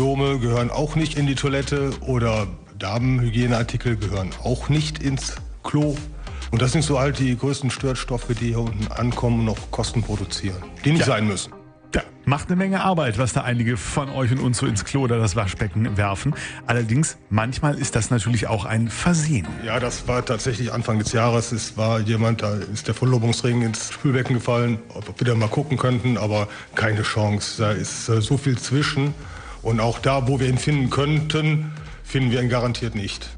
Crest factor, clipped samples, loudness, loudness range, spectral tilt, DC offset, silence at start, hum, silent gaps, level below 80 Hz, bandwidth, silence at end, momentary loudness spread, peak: 18 dB; under 0.1%; -22 LUFS; 2 LU; -5.5 dB/octave; under 0.1%; 0 s; none; none; -38 dBFS; 10 kHz; 0 s; 6 LU; -4 dBFS